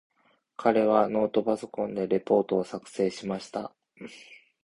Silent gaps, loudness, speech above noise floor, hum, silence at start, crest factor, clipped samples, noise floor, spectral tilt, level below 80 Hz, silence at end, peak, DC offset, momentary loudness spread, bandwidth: none; -27 LUFS; 21 dB; none; 0.6 s; 22 dB; under 0.1%; -48 dBFS; -6.5 dB/octave; -66 dBFS; 0.3 s; -6 dBFS; under 0.1%; 22 LU; 11.5 kHz